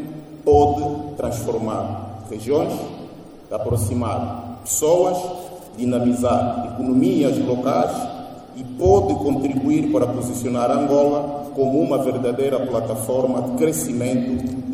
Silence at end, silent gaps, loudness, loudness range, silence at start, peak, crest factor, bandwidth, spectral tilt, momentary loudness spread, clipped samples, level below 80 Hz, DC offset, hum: 0 s; none; -20 LUFS; 5 LU; 0 s; -2 dBFS; 18 dB; 16 kHz; -6.5 dB/octave; 14 LU; under 0.1%; -44 dBFS; under 0.1%; none